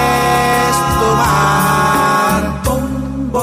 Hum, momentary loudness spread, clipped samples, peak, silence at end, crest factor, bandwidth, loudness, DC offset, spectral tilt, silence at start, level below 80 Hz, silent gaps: none; 7 LU; under 0.1%; -2 dBFS; 0 s; 10 dB; 16 kHz; -13 LUFS; under 0.1%; -4.5 dB/octave; 0 s; -28 dBFS; none